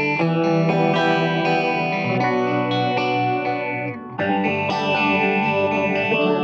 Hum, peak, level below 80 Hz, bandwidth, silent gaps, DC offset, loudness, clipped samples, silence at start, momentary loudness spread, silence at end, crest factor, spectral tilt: none; -6 dBFS; -68 dBFS; 7.4 kHz; none; under 0.1%; -20 LUFS; under 0.1%; 0 s; 5 LU; 0 s; 14 dB; -7 dB/octave